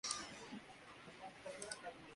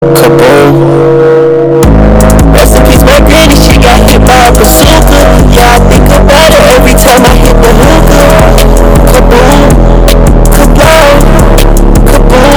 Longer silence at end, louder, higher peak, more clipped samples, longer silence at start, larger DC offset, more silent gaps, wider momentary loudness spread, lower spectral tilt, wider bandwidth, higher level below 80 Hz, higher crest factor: about the same, 0 s vs 0 s; second, -51 LUFS vs -3 LUFS; second, -24 dBFS vs 0 dBFS; second, under 0.1% vs 70%; about the same, 0.05 s vs 0 s; neither; neither; first, 12 LU vs 3 LU; second, -1.5 dB/octave vs -5 dB/octave; second, 11.5 kHz vs over 20 kHz; second, -78 dBFS vs -6 dBFS; first, 28 dB vs 2 dB